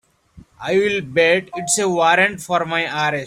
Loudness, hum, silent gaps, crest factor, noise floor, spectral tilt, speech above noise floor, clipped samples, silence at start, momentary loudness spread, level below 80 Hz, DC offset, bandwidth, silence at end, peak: -17 LUFS; none; none; 16 dB; -47 dBFS; -3 dB/octave; 29 dB; under 0.1%; 0.35 s; 6 LU; -56 dBFS; under 0.1%; 16 kHz; 0 s; -2 dBFS